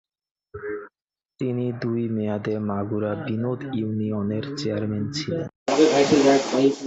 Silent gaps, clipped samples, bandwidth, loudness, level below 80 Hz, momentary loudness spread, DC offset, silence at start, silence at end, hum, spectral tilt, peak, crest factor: 5.56-5.66 s; under 0.1%; 8.2 kHz; -24 LUFS; -58 dBFS; 14 LU; under 0.1%; 0.55 s; 0 s; none; -6 dB/octave; -6 dBFS; 18 dB